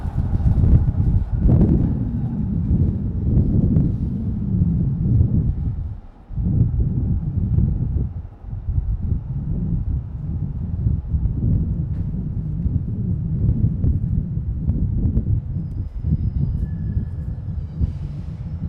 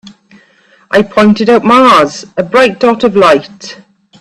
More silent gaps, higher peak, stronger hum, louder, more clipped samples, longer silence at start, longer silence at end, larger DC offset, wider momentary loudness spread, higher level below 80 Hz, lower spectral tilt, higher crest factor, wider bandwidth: neither; about the same, -2 dBFS vs 0 dBFS; neither; second, -22 LUFS vs -8 LUFS; second, under 0.1% vs 0.2%; second, 0 s vs 0.9 s; second, 0 s vs 0.45 s; neither; second, 10 LU vs 13 LU; first, -26 dBFS vs -48 dBFS; first, -12.5 dB/octave vs -5 dB/octave; first, 18 dB vs 10 dB; second, 2.3 kHz vs 12.5 kHz